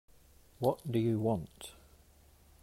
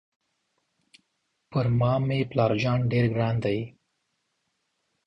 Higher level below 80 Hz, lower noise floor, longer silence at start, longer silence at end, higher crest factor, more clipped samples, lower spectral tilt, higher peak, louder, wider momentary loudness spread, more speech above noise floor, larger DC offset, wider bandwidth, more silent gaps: second, -62 dBFS vs -56 dBFS; second, -62 dBFS vs -76 dBFS; second, 0.6 s vs 1.5 s; second, 0.9 s vs 1.35 s; about the same, 20 dB vs 20 dB; neither; about the same, -7.5 dB/octave vs -8.5 dB/octave; second, -16 dBFS vs -8 dBFS; second, -34 LUFS vs -25 LUFS; first, 18 LU vs 7 LU; second, 29 dB vs 52 dB; neither; first, 16 kHz vs 6.4 kHz; neither